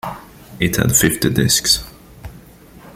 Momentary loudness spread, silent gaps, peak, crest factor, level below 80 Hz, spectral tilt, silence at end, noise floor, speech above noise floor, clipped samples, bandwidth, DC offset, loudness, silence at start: 12 LU; none; 0 dBFS; 20 dB; -38 dBFS; -3 dB/octave; 0.05 s; -42 dBFS; 26 dB; under 0.1%; 16.5 kHz; under 0.1%; -15 LUFS; 0.05 s